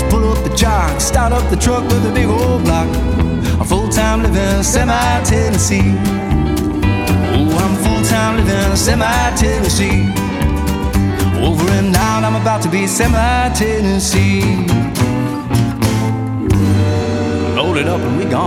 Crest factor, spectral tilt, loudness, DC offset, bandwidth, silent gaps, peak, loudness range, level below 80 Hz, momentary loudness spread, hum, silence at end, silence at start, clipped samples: 12 dB; -5 dB/octave; -14 LUFS; under 0.1%; 16.5 kHz; none; 0 dBFS; 1 LU; -20 dBFS; 3 LU; none; 0 s; 0 s; under 0.1%